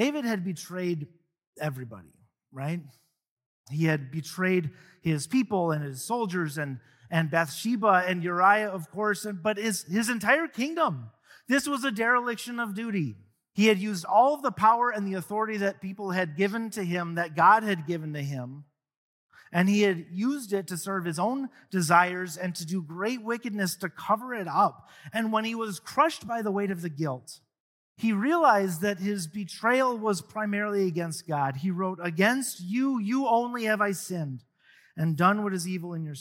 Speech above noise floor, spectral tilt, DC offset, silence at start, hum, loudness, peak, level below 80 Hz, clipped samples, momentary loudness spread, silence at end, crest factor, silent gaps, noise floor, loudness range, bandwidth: 33 dB; -5 dB/octave; under 0.1%; 0 s; none; -27 LUFS; -8 dBFS; -72 dBFS; under 0.1%; 12 LU; 0 s; 20 dB; 1.47-1.53 s, 3.31-3.37 s, 3.46-3.64 s, 18.97-19.29 s, 27.60-27.96 s; -60 dBFS; 4 LU; 17 kHz